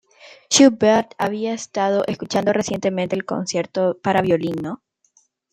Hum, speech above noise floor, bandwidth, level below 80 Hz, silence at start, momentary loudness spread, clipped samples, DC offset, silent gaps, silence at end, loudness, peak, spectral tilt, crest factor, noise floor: none; 42 dB; 14.5 kHz; -60 dBFS; 0.25 s; 11 LU; under 0.1%; under 0.1%; none; 0.8 s; -19 LUFS; -2 dBFS; -4 dB/octave; 18 dB; -61 dBFS